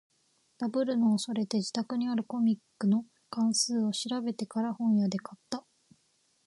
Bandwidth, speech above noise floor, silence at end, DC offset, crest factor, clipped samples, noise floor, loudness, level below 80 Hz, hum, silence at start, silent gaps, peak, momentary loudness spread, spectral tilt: 11.5 kHz; 42 dB; 0.85 s; under 0.1%; 16 dB; under 0.1%; -72 dBFS; -31 LUFS; -80 dBFS; none; 0.6 s; none; -16 dBFS; 11 LU; -5 dB/octave